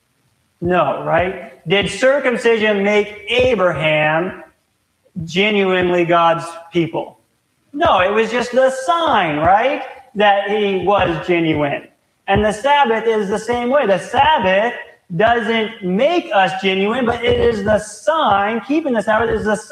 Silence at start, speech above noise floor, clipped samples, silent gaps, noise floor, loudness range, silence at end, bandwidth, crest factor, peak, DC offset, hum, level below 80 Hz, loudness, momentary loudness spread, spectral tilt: 0.6 s; 49 dB; under 0.1%; none; -64 dBFS; 2 LU; 0.05 s; 12 kHz; 16 dB; 0 dBFS; under 0.1%; none; -42 dBFS; -16 LUFS; 8 LU; -5 dB/octave